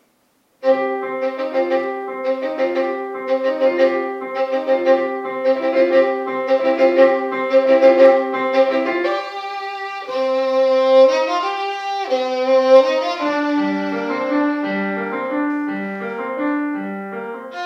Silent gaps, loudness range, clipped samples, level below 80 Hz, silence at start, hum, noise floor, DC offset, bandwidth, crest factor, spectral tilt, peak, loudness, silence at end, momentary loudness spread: none; 6 LU; under 0.1%; -76 dBFS; 0.6 s; none; -61 dBFS; under 0.1%; 6.8 kHz; 16 dB; -5.5 dB/octave; 0 dBFS; -18 LUFS; 0 s; 12 LU